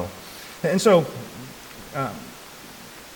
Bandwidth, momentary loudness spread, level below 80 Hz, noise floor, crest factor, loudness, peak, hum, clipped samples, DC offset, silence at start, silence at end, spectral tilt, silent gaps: 19 kHz; 23 LU; -58 dBFS; -42 dBFS; 20 dB; -22 LUFS; -6 dBFS; none; under 0.1%; under 0.1%; 0 s; 0 s; -5 dB/octave; none